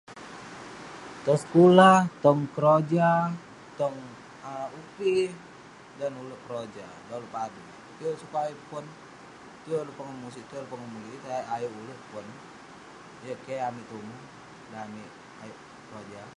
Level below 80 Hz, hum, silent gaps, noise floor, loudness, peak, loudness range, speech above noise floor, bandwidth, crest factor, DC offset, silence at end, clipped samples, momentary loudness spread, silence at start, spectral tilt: -70 dBFS; none; none; -49 dBFS; -25 LUFS; -2 dBFS; 18 LU; 22 dB; 11.5 kHz; 26 dB; under 0.1%; 0.1 s; under 0.1%; 24 LU; 0.1 s; -6.5 dB/octave